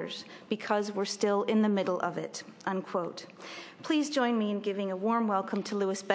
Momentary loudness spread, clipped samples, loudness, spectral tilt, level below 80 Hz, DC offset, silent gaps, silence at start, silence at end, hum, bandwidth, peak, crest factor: 13 LU; under 0.1%; -31 LUFS; -5 dB/octave; -86 dBFS; under 0.1%; none; 0 s; 0 s; none; 8 kHz; -10 dBFS; 20 dB